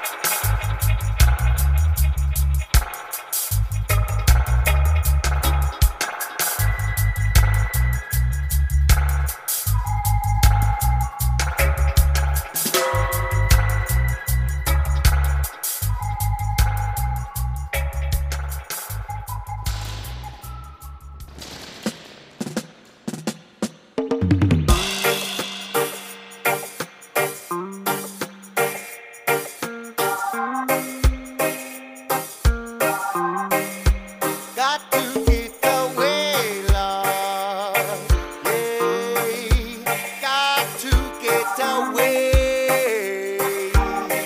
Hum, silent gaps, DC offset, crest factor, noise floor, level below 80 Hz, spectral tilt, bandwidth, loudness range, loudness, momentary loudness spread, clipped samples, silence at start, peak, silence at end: none; none; under 0.1%; 18 dB; -42 dBFS; -24 dBFS; -4.5 dB/octave; 16.5 kHz; 7 LU; -22 LUFS; 12 LU; under 0.1%; 0 s; -2 dBFS; 0 s